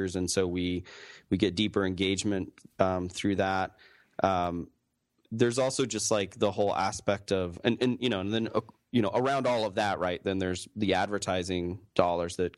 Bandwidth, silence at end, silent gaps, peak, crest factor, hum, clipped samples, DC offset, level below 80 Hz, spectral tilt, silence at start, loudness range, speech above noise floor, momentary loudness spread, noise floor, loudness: 12.5 kHz; 0.05 s; none; -6 dBFS; 24 dB; none; under 0.1%; under 0.1%; -60 dBFS; -4.5 dB/octave; 0 s; 1 LU; 47 dB; 6 LU; -76 dBFS; -29 LUFS